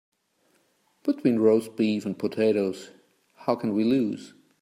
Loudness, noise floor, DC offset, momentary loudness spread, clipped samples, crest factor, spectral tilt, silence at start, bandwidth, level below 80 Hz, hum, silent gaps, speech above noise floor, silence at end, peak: -25 LUFS; -68 dBFS; under 0.1%; 11 LU; under 0.1%; 18 dB; -7 dB/octave; 1.05 s; 15 kHz; -74 dBFS; none; none; 44 dB; 0.35 s; -8 dBFS